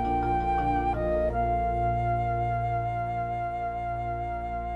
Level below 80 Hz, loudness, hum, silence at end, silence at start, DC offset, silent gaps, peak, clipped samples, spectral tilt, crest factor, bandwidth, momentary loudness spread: -38 dBFS; -28 LUFS; 60 Hz at -60 dBFS; 0 s; 0 s; under 0.1%; none; -16 dBFS; under 0.1%; -9 dB/octave; 12 dB; 7.4 kHz; 5 LU